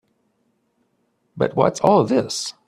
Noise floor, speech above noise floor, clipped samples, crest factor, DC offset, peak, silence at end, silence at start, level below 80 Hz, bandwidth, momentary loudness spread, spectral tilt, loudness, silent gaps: -68 dBFS; 49 dB; under 0.1%; 20 dB; under 0.1%; -2 dBFS; 0.15 s; 1.35 s; -58 dBFS; 14.5 kHz; 9 LU; -5.5 dB/octave; -19 LUFS; none